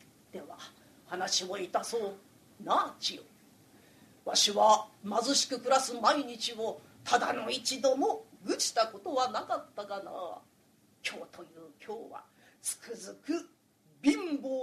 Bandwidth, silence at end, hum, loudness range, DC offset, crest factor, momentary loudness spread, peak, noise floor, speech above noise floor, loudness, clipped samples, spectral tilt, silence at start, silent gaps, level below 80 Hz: 14 kHz; 0 s; none; 12 LU; under 0.1%; 22 dB; 21 LU; -12 dBFS; -66 dBFS; 34 dB; -31 LUFS; under 0.1%; -1.5 dB/octave; 0.35 s; none; -78 dBFS